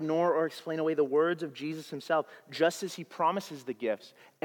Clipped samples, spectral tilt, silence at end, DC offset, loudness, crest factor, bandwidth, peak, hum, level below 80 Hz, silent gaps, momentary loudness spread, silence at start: under 0.1%; -5 dB/octave; 0.35 s; under 0.1%; -31 LUFS; 18 dB; 18 kHz; -12 dBFS; none; under -90 dBFS; none; 11 LU; 0 s